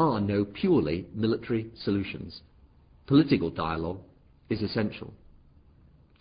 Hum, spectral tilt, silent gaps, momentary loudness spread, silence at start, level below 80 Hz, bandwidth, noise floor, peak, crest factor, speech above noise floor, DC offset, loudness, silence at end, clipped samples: none; -11 dB/octave; none; 18 LU; 0 s; -50 dBFS; 5.2 kHz; -58 dBFS; -8 dBFS; 20 dB; 31 dB; under 0.1%; -28 LUFS; 1.05 s; under 0.1%